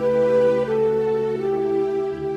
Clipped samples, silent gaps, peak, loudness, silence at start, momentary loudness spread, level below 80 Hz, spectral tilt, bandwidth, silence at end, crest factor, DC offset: under 0.1%; none; -10 dBFS; -21 LUFS; 0 s; 5 LU; -52 dBFS; -7.5 dB/octave; 8.2 kHz; 0 s; 10 dB; under 0.1%